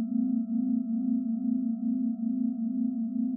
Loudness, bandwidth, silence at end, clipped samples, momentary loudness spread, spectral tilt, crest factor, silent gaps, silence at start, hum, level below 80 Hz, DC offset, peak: -30 LUFS; 1.4 kHz; 0 s; under 0.1%; 2 LU; -15 dB/octave; 10 dB; none; 0 s; none; under -90 dBFS; under 0.1%; -18 dBFS